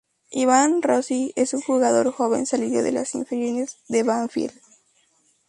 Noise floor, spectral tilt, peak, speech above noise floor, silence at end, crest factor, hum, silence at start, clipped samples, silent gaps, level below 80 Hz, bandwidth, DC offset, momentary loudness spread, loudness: -64 dBFS; -3.5 dB/octave; -4 dBFS; 42 dB; 1 s; 18 dB; none; 0.3 s; under 0.1%; none; -66 dBFS; 11.5 kHz; under 0.1%; 9 LU; -22 LUFS